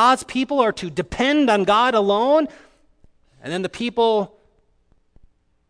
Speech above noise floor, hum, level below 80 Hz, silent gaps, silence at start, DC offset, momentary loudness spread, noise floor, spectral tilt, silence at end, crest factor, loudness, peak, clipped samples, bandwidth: 41 dB; none; -52 dBFS; none; 0 s; under 0.1%; 12 LU; -60 dBFS; -4.5 dB/octave; 1.45 s; 16 dB; -19 LUFS; -4 dBFS; under 0.1%; 11 kHz